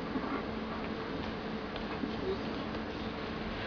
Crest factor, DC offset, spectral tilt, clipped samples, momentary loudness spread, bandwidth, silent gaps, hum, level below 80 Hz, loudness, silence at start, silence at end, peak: 16 dB; under 0.1%; -4 dB/octave; under 0.1%; 3 LU; 5.4 kHz; none; none; -52 dBFS; -38 LUFS; 0 s; 0 s; -22 dBFS